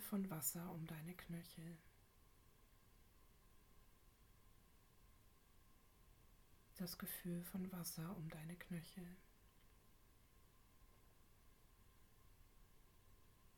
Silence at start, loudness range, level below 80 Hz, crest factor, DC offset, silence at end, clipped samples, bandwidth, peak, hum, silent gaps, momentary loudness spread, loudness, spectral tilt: 0 s; 10 LU; -72 dBFS; 26 dB; under 0.1%; 0 s; under 0.1%; 19 kHz; -30 dBFS; none; none; 14 LU; -50 LUFS; -4.5 dB/octave